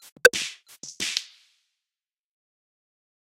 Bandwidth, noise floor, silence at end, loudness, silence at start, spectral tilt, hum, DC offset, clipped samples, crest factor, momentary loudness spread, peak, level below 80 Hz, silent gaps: 16 kHz; under -90 dBFS; 2.05 s; -24 LUFS; 0.25 s; 0.5 dB/octave; none; under 0.1%; under 0.1%; 26 dB; 22 LU; -4 dBFS; -68 dBFS; none